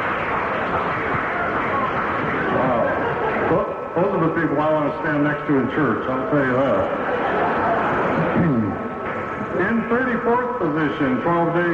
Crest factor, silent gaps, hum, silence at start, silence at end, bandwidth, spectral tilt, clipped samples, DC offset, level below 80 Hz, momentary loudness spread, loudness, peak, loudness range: 12 dB; none; none; 0 s; 0 s; 7.8 kHz; -8.5 dB/octave; under 0.1%; under 0.1%; -48 dBFS; 3 LU; -21 LUFS; -8 dBFS; 1 LU